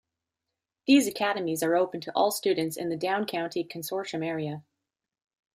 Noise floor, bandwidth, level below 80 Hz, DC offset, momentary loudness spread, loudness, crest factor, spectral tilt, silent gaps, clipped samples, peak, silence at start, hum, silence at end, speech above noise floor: -87 dBFS; 15.5 kHz; -76 dBFS; under 0.1%; 11 LU; -28 LUFS; 18 dB; -4.5 dB/octave; none; under 0.1%; -10 dBFS; 0.85 s; none; 0.95 s; 60 dB